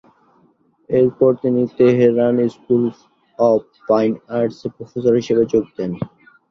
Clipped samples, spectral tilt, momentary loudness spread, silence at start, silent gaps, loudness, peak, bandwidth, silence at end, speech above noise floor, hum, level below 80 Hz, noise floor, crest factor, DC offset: under 0.1%; -8.5 dB/octave; 11 LU; 0.9 s; none; -17 LUFS; -2 dBFS; 6.6 kHz; 0.45 s; 41 dB; none; -56 dBFS; -57 dBFS; 16 dB; under 0.1%